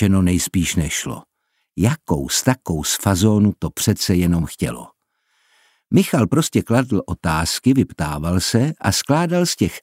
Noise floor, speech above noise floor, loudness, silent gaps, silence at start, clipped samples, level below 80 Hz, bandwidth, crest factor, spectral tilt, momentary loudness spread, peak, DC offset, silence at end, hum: -67 dBFS; 49 dB; -19 LUFS; none; 0 s; under 0.1%; -38 dBFS; 16 kHz; 18 dB; -5 dB/octave; 7 LU; -2 dBFS; under 0.1%; 0.05 s; none